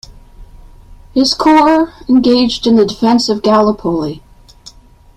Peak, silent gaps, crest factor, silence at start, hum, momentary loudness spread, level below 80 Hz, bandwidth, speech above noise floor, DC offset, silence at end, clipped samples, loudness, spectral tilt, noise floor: 0 dBFS; none; 12 dB; 0.1 s; none; 10 LU; -40 dBFS; 12.5 kHz; 29 dB; under 0.1%; 0.5 s; under 0.1%; -11 LUFS; -5 dB/octave; -40 dBFS